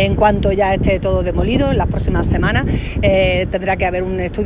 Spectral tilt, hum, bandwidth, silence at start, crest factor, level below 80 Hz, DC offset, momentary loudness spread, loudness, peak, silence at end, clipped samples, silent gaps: -11 dB/octave; none; 4 kHz; 0 s; 14 dB; -22 dBFS; under 0.1%; 4 LU; -16 LUFS; 0 dBFS; 0 s; under 0.1%; none